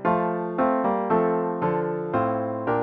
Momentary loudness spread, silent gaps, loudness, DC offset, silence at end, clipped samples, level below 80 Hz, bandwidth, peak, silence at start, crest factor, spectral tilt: 4 LU; none; -24 LUFS; under 0.1%; 0 s; under 0.1%; -60 dBFS; 4.7 kHz; -8 dBFS; 0 s; 16 dB; -11 dB/octave